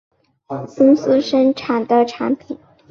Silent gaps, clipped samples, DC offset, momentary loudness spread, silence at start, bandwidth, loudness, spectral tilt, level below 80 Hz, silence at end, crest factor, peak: none; under 0.1%; under 0.1%; 17 LU; 0.5 s; 7 kHz; -16 LUFS; -6.5 dB/octave; -60 dBFS; 0.35 s; 14 dB; -2 dBFS